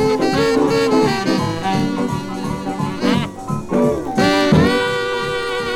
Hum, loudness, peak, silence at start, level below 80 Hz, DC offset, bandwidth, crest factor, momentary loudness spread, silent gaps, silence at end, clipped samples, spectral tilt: none; -17 LUFS; -2 dBFS; 0 s; -40 dBFS; under 0.1%; 16.5 kHz; 16 dB; 10 LU; none; 0 s; under 0.1%; -5.5 dB/octave